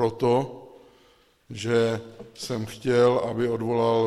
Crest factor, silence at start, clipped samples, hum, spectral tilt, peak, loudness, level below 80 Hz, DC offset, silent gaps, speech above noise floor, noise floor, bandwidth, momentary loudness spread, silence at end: 16 dB; 0 s; under 0.1%; none; -6 dB/octave; -10 dBFS; -25 LUFS; -62 dBFS; under 0.1%; none; 36 dB; -60 dBFS; 13.5 kHz; 17 LU; 0 s